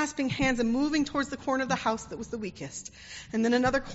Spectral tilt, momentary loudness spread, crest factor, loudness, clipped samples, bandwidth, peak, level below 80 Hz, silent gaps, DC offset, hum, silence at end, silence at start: -4 dB/octave; 13 LU; 16 dB; -29 LUFS; under 0.1%; 8 kHz; -12 dBFS; -50 dBFS; none; under 0.1%; none; 0 s; 0 s